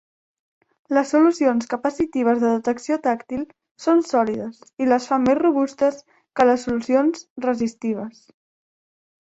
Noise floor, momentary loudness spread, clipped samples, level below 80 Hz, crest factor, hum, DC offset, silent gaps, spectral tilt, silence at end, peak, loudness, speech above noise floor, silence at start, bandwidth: under -90 dBFS; 11 LU; under 0.1%; -60 dBFS; 18 dB; none; under 0.1%; 3.71-3.75 s, 7.30-7.36 s; -5.5 dB/octave; 1.1 s; -2 dBFS; -21 LUFS; over 70 dB; 0.9 s; 8.2 kHz